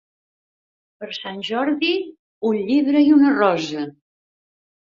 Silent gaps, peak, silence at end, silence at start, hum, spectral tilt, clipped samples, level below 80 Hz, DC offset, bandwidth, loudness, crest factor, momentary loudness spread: 2.19-2.41 s; -4 dBFS; 0.95 s; 1 s; none; -5.5 dB/octave; under 0.1%; -68 dBFS; under 0.1%; 7.4 kHz; -19 LUFS; 18 dB; 18 LU